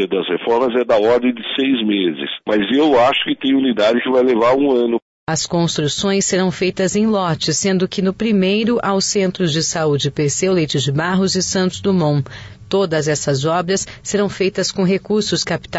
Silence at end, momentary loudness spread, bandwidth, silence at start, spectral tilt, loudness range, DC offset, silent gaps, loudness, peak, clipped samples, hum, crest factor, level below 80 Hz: 0 s; 5 LU; 8 kHz; 0 s; -4.5 dB/octave; 3 LU; under 0.1%; 5.02-5.27 s; -17 LUFS; -6 dBFS; under 0.1%; none; 10 dB; -50 dBFS